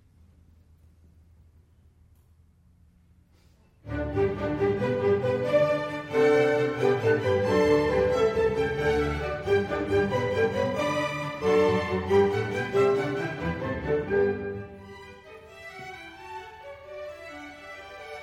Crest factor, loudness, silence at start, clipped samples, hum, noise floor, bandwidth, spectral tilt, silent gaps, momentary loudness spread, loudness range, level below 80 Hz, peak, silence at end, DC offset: 16 dB; -25 LUFS; 3.85 s; under 0.1%; none; -59 dBFS; 12.5 kHz; -6.5 dB/octave; none; 19 LU; 12 LU; -48 dBFS; -10 dBFS; 0 s; under 0.1%